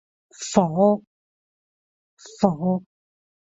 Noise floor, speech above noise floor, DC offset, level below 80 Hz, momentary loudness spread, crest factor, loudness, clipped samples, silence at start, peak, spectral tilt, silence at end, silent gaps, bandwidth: under -90 dBFS; over 70 dB; under 0.1%; -62 dBFS; 9 LU; 22 dB; -22 LUFS; under 0.1%; 0.4 s; -2 dBFS; -6.5 dB/octave; 0.7 s; 1.07-2.17 s; 8 kHz